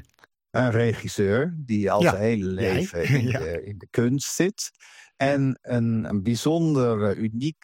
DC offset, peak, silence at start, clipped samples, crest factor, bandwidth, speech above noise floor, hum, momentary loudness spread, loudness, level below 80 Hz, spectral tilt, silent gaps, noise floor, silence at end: under 0.1%; -4 dBFS; 0.55 s; under 0.1%; 20 dB; 16.5 kHz; 37 dB; none; 7 LU; -24 LUFS; -54 dBFS; -6 dB/octave; none; -60 dBFS; 0.1 s